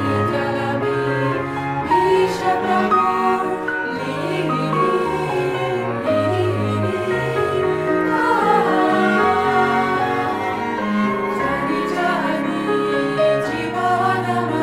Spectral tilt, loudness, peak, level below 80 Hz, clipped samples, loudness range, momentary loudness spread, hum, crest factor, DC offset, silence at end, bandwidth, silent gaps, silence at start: -6.5 dB/octave; -19 LUFS; -4 dBFS; -52 dBFS; under 0.1%; 3 LU; 6 LU; none; 16 dB; under 0.1%; 0 s; 15.5 kHz; none; 0 s